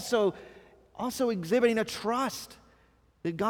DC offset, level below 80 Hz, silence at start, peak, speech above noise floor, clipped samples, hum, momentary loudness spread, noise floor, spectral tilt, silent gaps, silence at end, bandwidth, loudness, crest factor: under 0.1%; -64 dBFS; 0 s; -12 dBFS; 35 dB; under 0.1%; none; 19 LU; -64 dBFS; -4.5 dB/octave; none; 0 s; 20 kHz; -30 LUFS; 18 dB